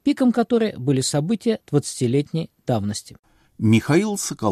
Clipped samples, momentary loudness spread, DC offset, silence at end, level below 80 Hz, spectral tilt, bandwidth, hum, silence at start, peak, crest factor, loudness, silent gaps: under 0.1%; 7 LU; under 0.1%; 0 s; -56 dBFS; -5.5 dB/octave; 14.5 kHz; none; 0.05 s; -4 dBFS; 16 dB; -21 LUFS; 3.19-3.23 s